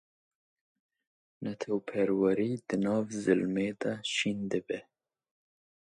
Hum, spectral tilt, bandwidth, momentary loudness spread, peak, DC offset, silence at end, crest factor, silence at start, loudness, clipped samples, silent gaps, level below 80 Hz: none; -5.5 dB/octave; 11 kHz; 11 LU; -12 dBFS; under 0.1%; 1.15 s; 22 dB; 1.4 s; -31 LUFS; under 0.1%; none; -70 dBFS